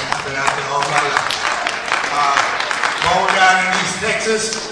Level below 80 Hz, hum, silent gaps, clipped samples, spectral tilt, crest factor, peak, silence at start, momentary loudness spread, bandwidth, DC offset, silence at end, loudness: -50 dBFS; none; none; under 0.1%; -1.5 dB/octave; 18 dB; 0 dBFS; 0 s; 6 LU; 11 kHz; under 0.1%; 0 s; -16 LUFS